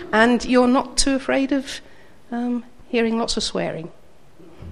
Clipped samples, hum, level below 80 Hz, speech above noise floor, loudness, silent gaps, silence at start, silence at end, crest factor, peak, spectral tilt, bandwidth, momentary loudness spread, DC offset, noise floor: under 0.1%; none; -38 dBFS; 30 dB; -21 LUFS; none; 0 s; 0 s; 20 dB; 0 dBFS; -3.5 dB/octave; 12 kHz; 16 LU; 0.7%; -50 dBFS